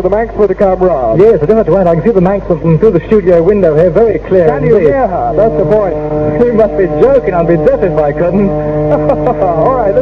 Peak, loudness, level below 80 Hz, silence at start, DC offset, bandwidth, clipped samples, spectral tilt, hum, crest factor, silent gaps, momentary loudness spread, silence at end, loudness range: 0 dBFS; -9 LUFS; -28 dBFS; 0 s; under 0.1%; 6.4 kHz; 2%; -10 dB/octave; none; 8 dB; none; 4 LU; 0 s; 1 LU